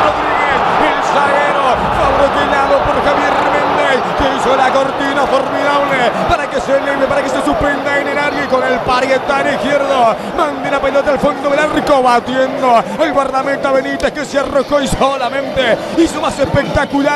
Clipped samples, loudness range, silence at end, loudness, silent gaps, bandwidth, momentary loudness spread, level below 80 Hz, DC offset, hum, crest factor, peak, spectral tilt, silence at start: under 0.1%; 2 LU; 0 s; -13 LUFS; none; 13.5 kHz; 3 LU; -34 dBFS; under 0.1%; none; 12 dB; 0 dBFS; -4.5 dB/octave; 0 s